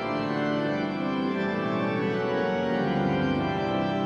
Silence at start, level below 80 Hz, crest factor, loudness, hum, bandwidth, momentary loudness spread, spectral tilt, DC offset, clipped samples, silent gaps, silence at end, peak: 0 s; -54 dBFS; 12 dB; -27 LUFS; none; 7.4 kHz; 3 LU; -7.5 dB/octave; under 0.1%; under 0.1%; none; 0 s; -14 dBFS